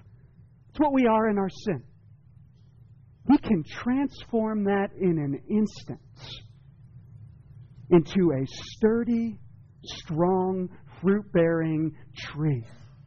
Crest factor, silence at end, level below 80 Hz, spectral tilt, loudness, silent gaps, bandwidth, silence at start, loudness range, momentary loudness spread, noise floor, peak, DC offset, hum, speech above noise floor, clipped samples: 18 dB; 0.2 s; -54 dBFS; -7 dB/octave; -26 LUFS; none; 7.2 kHz; 0.75 s; 3 LU; 19 LU; -54 dBFS; -10 dBFS; under 0.1%; none; 28 dB; under 0.1%